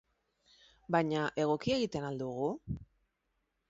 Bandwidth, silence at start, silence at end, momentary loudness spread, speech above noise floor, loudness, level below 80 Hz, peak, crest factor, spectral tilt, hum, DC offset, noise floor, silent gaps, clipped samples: 7.6 kHz; 0.9 s; 0.85 s; 11 LU; 48 dB; -34 LUFS; -60 dBFS; -16 dBFS; 20 dB; -5 dB/octave; none; under 0.1%; -81 dBFS; none; under 0.1%